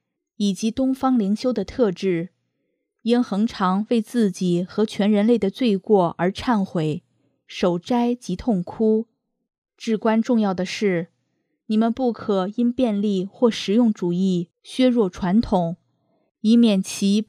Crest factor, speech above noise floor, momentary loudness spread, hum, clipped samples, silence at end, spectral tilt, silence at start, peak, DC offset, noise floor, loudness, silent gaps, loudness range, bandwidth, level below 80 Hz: 16 dB; 54 dB; 7 LU; none; under 0.1%; 0.05 s; -6.5 dB/octave; 0.4 s; -4 dBFS; under 0.1%; -74 dBFS; -21 LUFS; 9.58-9.62 s, 16.31-16.35 s; 3 LU; 11.5 kHz; -52 dBFS